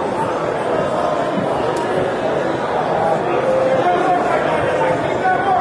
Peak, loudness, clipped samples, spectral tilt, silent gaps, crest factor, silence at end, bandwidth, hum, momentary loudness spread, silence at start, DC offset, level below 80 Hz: -4 dBFS; -18 LUFS; under 0.1%; -6 dB/octave; none; 12 dB; 0 s; 11 kHz; none; 4 LU; 0 s; under 0.1%; -48 dBFS